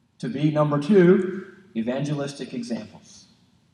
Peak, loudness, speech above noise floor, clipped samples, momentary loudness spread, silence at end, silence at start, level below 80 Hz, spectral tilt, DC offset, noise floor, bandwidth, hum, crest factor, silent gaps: -6 dBFS; -23 LUFS; 36 dB; under 0.1%; 17 LU; 0.75 s; 0.2 s; -72 dBFS; -7.5 dB/octave; under 0.1%; -58 dBFS; 10.5 kHz; none; 18 dB; none